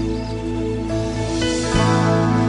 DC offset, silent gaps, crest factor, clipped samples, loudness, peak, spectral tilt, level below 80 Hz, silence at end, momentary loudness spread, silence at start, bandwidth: under 0.1%; none; 16 dB; under 0.1%; -20 LUFS; -4 dBFS; -6 dB/octave; -32 dBFS; 0 s; 8 LU; 0 s; 11 kHz